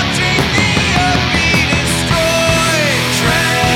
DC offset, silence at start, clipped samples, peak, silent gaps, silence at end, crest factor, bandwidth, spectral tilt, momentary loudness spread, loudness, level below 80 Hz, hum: under 0.1%; 0 s; under 0.1%; 0 dBFS; none; 0 s; 12 dB; 18 kHz; -3.5 dB/octave; 1 LU; -12 LUFS; -30 dBFS; none